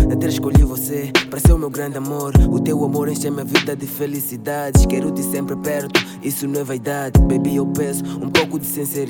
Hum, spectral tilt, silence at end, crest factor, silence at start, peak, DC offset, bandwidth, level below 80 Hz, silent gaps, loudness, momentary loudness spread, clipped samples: none; -5.5 dB/octave; 0 s; 16 dB; 0 s; 0 dBFS; under 0.1%; 19 kHz; -22 dBFS; none; -19 LUFS; 9 LU; under 0.1%